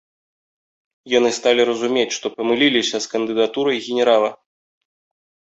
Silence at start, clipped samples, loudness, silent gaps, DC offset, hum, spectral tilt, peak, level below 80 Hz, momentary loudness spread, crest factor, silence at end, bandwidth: 1.05 s; under 0.1%; -18 LUFS; none; under 0.1%; none; -2.5 dB/octave; -2 dBFS; -64 dBFS; 6 LU; 18 dB; 1.05 s; 8.2 kHz